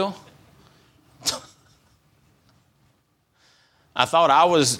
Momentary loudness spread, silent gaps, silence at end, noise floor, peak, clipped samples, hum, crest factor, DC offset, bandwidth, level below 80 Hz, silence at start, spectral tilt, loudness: 18 LU; none; 0 s; -66 dBFS; 0 dBFS; under 0.1%; none; 24 dB; under 0.1%; 17 kHz; -66 dBFS; 0 s; -3 dB/octave; -20 LUFS